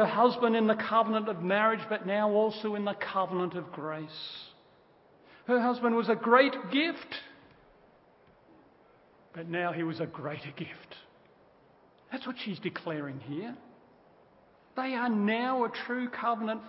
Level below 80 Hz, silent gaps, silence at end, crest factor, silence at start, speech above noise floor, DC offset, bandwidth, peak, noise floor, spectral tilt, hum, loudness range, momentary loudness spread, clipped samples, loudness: -78 dBFS; none; 0 s; 22 dB; 0 s; 32 dB; under 0.1%; 5.8 kHz; -8 dBFS; -61 dBFS; -9.5 dB/octave; none; 11 LU; 17 LU; under 0.1%; -30 LUFS